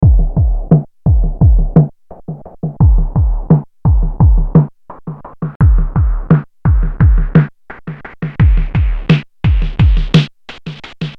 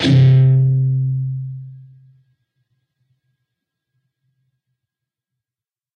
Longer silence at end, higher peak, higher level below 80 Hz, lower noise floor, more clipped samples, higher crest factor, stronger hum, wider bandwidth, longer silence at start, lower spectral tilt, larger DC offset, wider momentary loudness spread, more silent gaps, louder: second, 0 s vs 4.2 s; about the same, 0 dBFS vs -2 dBFS; first, -14 dBFS vs -54 dBFS; second, -29 dBFS vs under -90 dBFS; neither; about the same, 12 dB vs 16 dB; neither; about the same, 6 kHz vs 6.6 kHz; about the same, 0 s vs 0 s; about the same, -9 dB/octave vs -8 dB/octave; neither; second, 18 LU vs 21 LU; first, 5.56-5.60 s vs none; about the same, -13 LUFS vs -15 LUFS